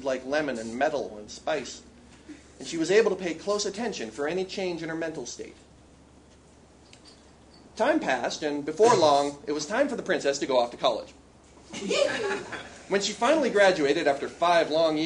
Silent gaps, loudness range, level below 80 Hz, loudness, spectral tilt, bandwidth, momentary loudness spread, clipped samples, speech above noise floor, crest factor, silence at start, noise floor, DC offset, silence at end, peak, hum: none; 9 LU; -60 dBFS; -26 LUFS; -3.5 dB/octave; 10.5 kHz; 16 LU; under 0.1%; 28 dB; 20 dB; 0 s; -54 dBFS; under 0.1%; 0 s; -6 dBFS; none